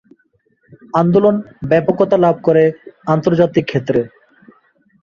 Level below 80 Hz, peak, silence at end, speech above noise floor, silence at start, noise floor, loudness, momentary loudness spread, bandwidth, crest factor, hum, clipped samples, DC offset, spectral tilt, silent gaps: -52 dBFS; 0 dBFS; 0.95 s; 47 dB; 0.95 s; -60 dBFS; -15 LUFS; 7 LU; 7 kHz; 16 dB; none; under 0.1%; under 0.1%; -8.5 dB/octave; none